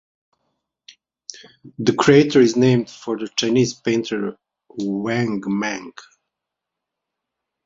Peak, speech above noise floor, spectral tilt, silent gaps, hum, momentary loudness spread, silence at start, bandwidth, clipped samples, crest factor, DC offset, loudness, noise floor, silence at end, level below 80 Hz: -2 dBFS; 64 dB; -5.5 dB/octave; none; none; 23 LU; 1.65 s; 7.8 kHz; under 0.1%; 20 dB; under 0.1%; -19 LUFS; -83 dBFS; 1.65 s; -60 dBFS